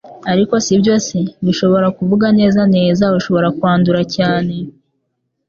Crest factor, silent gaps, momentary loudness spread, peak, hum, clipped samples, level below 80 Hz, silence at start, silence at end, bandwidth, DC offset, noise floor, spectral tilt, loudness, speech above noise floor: 12 dB; none; 7 LU; -2 dBFS; none; under 0.1%; -48 dBFS; 0.05 s; 0.8 s; 7.4 kHz; under 0.1%; -70 dBFS; -6 dB/octave; -14 LUFS; 57 dB